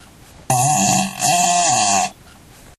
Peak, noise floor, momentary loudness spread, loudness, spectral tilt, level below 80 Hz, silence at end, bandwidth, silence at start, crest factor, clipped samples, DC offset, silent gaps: -2 dBFS; -44 dBFS; 5 LU; -16 LUFS; -2.5 dB/octave; -52 dBFS; 0.65 s; 14.5 kHz; 0.5 s; 16 dB; under 0.1%; under 0.1%; none